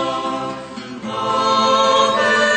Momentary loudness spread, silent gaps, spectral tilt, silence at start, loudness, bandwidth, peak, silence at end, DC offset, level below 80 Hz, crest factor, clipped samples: 15 LU; none; -2.5 dB/octave; 0 s; -16 LUFS; 9 kHz; -4 dBFS; 0 s; under 0.1%; -58 dBFS; 14 dB; under 0.1%